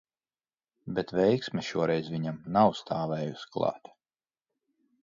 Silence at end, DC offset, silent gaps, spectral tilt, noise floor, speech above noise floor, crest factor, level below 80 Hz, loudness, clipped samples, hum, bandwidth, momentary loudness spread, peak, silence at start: 1.25 s; under 0.1%; none; -7 dB/octave; under -90 dBFS; over 61 dB; 22 dB; -66 dBFS; -29 LUFS; under 0.1%; none; 7.6 kHz; 10 LU; -10 dBFS; 0.85 s